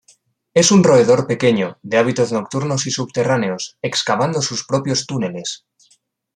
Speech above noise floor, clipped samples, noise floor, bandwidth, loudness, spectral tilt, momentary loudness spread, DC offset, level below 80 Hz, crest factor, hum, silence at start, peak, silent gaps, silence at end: 39 dB; under 0.1%; -56 dBFS; 10.5 kHz; -17 LUFS; -4.5 dB/octave; 12 LU; under 0.1%; -58 dBFS; 18 dB; none; 0.55 s; 0 dBFS; none; 0.8 s